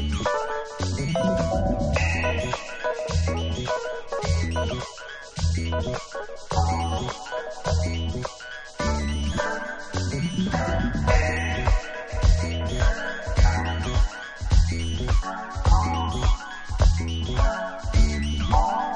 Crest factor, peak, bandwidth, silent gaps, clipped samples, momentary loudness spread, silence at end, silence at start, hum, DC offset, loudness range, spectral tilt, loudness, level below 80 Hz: 18 dB; -6 dBFS; 9.4 kHz; none; under 0.1%; 8 LU; 0 s; 0 s; none; under 0.1%; 4 LU; -5.5 dB/octave; -26 LUFS; -26 dBFS